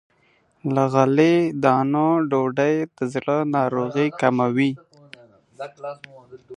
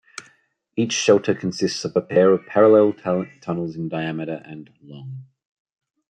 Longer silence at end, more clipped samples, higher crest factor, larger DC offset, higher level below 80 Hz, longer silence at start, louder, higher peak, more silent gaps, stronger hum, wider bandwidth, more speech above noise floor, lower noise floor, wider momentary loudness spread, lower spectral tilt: second, 0 s vs 0.9 s; neither; about the same, 20 dB vs 18 dB; neither; about the same, -68 dBFS vs -68 dBFS; first, 0.65 s vs 0.2 s; about the same, -20 LUFS vs -20 LUFS; about the same, -2 dBFS vs -4 dBFS; neither; neither; about the same, 10.5 kHz vs 9.6 kHz; about the same, 41 dB vs 40 dB; about the same, -62 dBFS vs -60 dBFS; second, 17 LU vs 24 LU; first, -7.5 dB/octave vs -5 dB/octave